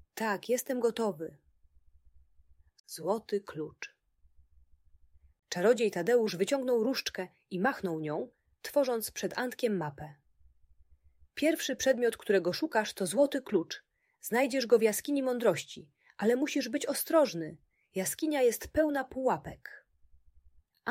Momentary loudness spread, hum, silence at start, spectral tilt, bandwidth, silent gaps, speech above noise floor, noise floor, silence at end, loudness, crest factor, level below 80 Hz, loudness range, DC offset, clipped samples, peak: 16 LU; none; 0.15 s; -4 dB/octave; 16 kHz; 2.80-2.84 s; 33 dB; -64 dBFS; 0 s; -31 LUFS; 20 dB; -64 dBFS; 8 LU; under 0.1%; under 0.1%; -12 dBFS